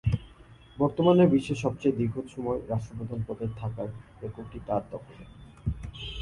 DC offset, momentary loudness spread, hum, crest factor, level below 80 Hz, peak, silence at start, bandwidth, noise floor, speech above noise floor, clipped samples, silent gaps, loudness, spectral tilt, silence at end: under 0.1%; 19 LU; none; 20 dB; -46 dBFS; -8 dBFS; 0.05 s; 11.5 kHz; -52 dBFS; 24 dB; under 0.1%; none; -29 LUFS; -8 dB/octave; 0 s